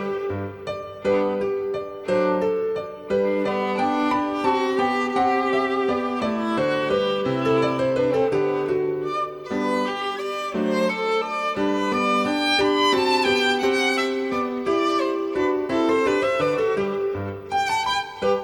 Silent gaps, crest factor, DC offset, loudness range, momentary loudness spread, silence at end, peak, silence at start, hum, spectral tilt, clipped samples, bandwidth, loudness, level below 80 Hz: none; 14 dB; under 0.1%; 3 LU; 7 LU; 0 s; -8 dBFS; 0 s; none; -5 dB/octave; under 0.1%; 18 kHz; -22 LUFS; -56 dBFS